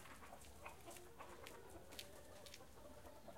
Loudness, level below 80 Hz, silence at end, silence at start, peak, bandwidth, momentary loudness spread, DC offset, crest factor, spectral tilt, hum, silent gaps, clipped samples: -58 LUFS; -70 dBFS; 0 s; 0 s; -32 dBFS; 16 kHz; 4 LU; under 0.1%; 28 dB; -3 dB/octave; none; none; under 0.1%